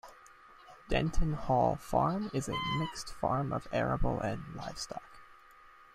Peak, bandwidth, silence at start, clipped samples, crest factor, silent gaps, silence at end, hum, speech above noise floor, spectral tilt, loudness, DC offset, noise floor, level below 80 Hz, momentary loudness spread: -14 dBFS; 14 kHz; 0.05 s; under 0.1%; 18 dB; none; 0.3 s; none; 26 dB; -6 dB/octave; -34 LUFS; under 0.1%; -57 dBFS; -42 dBFS; 12 LU